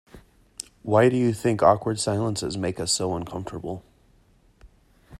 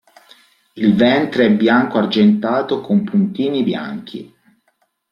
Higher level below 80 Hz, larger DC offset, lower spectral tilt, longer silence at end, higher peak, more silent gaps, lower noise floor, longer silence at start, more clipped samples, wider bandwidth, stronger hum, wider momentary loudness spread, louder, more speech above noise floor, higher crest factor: about the same, -54 dBFS vs -58 dBFS; neither; second, -5 dB/octave vs -8 dB/octave; second, 0.05 s vs 0.85 s; about the same, -4 dBFS vs -2 dBFS; neither; second, -59 dBFS vs -65 dBFS; second, 0.15 s vs 0.75 s; neither; first, 15.5 kHz vs 6 kHz; neither; first, 18 LU vs 12 LU; second, -23 LUFS vs -15 LUFS; second, 36 dB vs 49 dB; first, 22 dB vs 16 dB